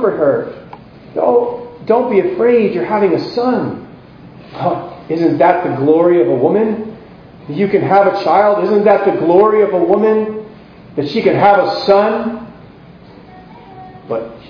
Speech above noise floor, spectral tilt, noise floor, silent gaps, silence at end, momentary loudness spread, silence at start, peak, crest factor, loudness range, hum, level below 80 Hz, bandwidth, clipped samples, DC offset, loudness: 26 dB; -8.5 dB/octave; -38 dBFS; none; 0 s; 13 LU; 0 s; 0 dBFS; 14 dB; 4 LU; none; -52 dBFS; 5.4 kHz; under 0.1%; under 0.1%; -13 LUFS